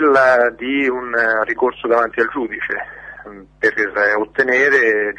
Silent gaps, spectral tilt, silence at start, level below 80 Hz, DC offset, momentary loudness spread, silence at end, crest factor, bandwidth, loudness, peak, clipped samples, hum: none; -4.5 dB/octave; 0 s; -52 dBFS; under 0.1%; 12 LU; 0.05 s; 14 dB; 9.8 kHz; -16 LUFS; -2 dBFS; under 0.1%; none